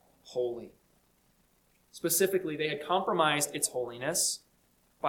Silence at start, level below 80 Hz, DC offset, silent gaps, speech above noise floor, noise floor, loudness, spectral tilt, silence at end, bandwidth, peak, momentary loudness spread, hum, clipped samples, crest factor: 0.25 s; -72 dBFS; under 0.1%; none; 38 dB; -69 dBFS; -30 LUFS; -2.5 dB/octave; 0 s; 19 kHz; -12 dBFS; 10 LU; 60 Hz at -65 dBFS; under 0.1%; 22 dB